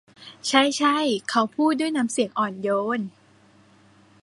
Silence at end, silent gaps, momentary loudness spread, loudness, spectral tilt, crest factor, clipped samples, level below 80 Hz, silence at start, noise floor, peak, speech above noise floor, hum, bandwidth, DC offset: 1.15 s; none; 8 LU; -23 LUFS; -3.5 dB/octave; 22 dB; under 0.1%; -74 dBFS; 0.2 s; -56 dBFS; -2 dBFS; 33 dB; none; 11.5 kHz; under 0.1%